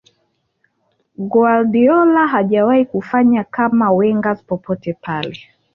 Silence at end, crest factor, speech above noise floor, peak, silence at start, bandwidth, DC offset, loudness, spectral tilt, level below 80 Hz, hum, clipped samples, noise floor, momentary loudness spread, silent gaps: 0.4 s; 12 dB; 52 dB; -2 dBFS; 1.2 s; 4.4 kHz; under 0.1%; -15 LUFS; -9 dB/octave; -58 dBFS; none; under 0.1%; -66 dBFS; 11 LU; none